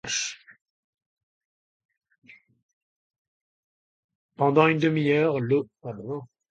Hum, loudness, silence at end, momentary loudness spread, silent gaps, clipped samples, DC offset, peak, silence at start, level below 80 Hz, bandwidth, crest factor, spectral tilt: none; -24 LUFS; 0.25 s; 17 LU; 0.61-0.93 s, 1.06-1.17 s, 1.23-1.89 s, 2.18-2.22 s, 2.63-3.10 s, 3.18-4.09 s, 4.15-4.29 s; under 0.1%; under 0.1%; -4 dBFS; 0.05 s; -72 dBFS; 9.2 kHz; 24 dB; -5 dB/octave